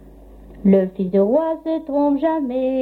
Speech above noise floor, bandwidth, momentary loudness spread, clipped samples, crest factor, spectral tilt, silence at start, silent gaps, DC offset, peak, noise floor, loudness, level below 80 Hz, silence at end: 24 dB; 4.4 kHz; 6 LU; under 0.1%; 16 dB; -10.5 dB/octave; 0.05 s; none; under 0.1%; -2 dBFS; -42 dBFS; -19 LUFS; -48 dBFS; 0 s